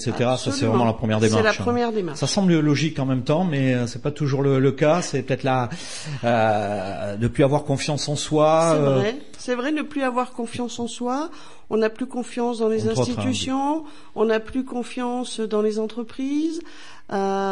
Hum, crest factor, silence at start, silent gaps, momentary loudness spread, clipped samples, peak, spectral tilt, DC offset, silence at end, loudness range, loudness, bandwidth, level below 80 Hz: none; 16 dB; 0 s; none; 10 LU; under 0.1%; -6 dBFS; -5.5 dB/octave; 1%; 0 s; 5 LU; -22 LUFS; 11.5 kHz; -52 dBFS